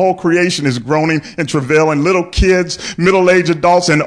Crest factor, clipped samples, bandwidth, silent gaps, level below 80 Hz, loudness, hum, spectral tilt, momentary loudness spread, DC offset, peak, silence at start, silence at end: 10 dB; under 0.1%; 10.5 kHz; none; -28 dBFS; -13 LUFS; none; -5 dB/octave; 6 LU; under 0.1%; -2 dBFS; 0 s; 0 s